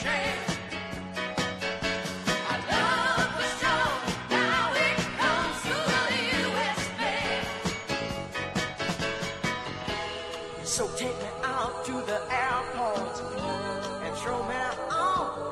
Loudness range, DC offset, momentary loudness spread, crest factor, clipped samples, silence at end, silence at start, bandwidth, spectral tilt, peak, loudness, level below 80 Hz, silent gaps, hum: 5 LU; under 0.1%; 8 LU; 18 dB; under 0.1%; 0 s; 0 s; 13 kHz; -3.5 dB/octave; -10 dBFS; -29 LUFS; -52 dBFS; none; none